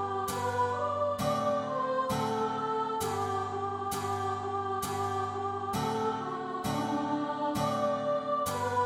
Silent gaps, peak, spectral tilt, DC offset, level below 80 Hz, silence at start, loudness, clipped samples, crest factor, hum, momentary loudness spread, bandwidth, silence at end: none; -16 dBFS; -5 dB/octave; under 0.1%; -62 dBFS; 0 s; -32 LUFS; under 0.1%; 16 dB; none; 4 LU; 16.5 kHz; 0 s